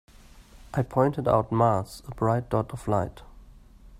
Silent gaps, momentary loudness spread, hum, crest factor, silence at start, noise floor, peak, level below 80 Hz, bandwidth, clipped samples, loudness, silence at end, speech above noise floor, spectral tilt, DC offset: none; 9 LU; none; 20 dB; 0.35 s; -50 dBFS; -6 dBFS; -48 dBFS; 15 kHz; under 0.1%; -26 LUFS; 0.05 s; 25 dB; -8 dB/octave; under 0.1%